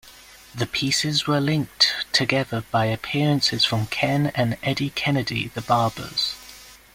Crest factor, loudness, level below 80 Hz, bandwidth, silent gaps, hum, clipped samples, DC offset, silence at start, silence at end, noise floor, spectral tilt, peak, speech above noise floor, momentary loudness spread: 20 dB; -22 LUFS; -54 dBFS; 16.5 kHz; none; none; under 0.1%; under 0.1%; 0.05 s; 0.2 s; -47 dBFS; -4.5 dB/octave; -2 dBFS; 24 dB; 7 LU